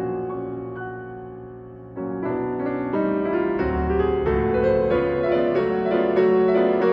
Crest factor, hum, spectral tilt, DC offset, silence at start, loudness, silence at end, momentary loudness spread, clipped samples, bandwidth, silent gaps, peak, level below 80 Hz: 14 dB; none; -10 dB/octave; under 0.1%; 0 s; -22 LUFS; 0 s; 17 LU; under 0.1%; 5.4 kHz; none; -8 dBFS; -40 dBFS